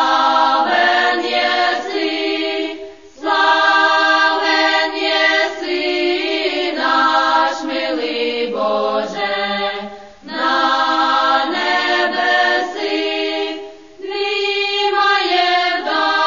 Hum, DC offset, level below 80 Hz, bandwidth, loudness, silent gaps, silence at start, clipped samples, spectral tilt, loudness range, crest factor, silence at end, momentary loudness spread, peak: none; 0.4%; -60 dBFS; 7.4 kHz; -15 LUFS; none; 0 s; under 0.1%; -2 dB/octave; 3 LU; 14 dB; 0 s; 9 LU; -2 dBFS